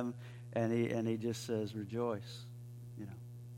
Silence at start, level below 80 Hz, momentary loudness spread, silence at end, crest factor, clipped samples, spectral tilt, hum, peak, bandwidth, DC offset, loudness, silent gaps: 0 s; -72 dBFS; 16 LU; 0 s; 18 dB; under 0.1%; -6.5 dB/octave; 60 Hz at -50 dBFS; -22 dBFS; 16.5 kHz; under 0.1%; -39 LUFS; none